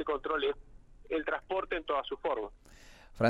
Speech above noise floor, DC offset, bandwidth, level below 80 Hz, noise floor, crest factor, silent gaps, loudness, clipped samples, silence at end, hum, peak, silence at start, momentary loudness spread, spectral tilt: 21 dB; under 0.1%; 11.5 kHz; -56 dBFS; -55 dBFS; 20 dB; none; -35 LUFS; under 0.1%; 0 s; none; -14 dBFS; 0 s; 5 LU; -6 dB/octave